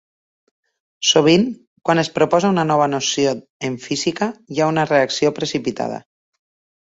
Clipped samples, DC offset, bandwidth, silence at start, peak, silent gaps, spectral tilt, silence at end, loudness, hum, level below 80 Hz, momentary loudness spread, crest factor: under 0.1%; under 0.1%; 8 kHz; 1 s; 0 dBFS; 1.67-1.76 s, 3.50-3.60 s; -4 dB/octave; 0.85 s; -18 LUFS; none; -58 dBFS; 11 LU; 18 dB